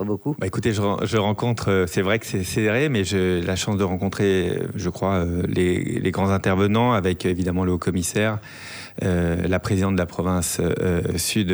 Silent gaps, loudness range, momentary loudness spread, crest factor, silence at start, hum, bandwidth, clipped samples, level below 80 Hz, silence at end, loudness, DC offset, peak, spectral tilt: none; 2 LU; 5 LU; 14 dB; 0 s; none; over 20 kHz; under 0.1%; -44 dBFS; 0 s; -22 LUFS; under 0.1%; -8 dBFS; -5.5 dB/octave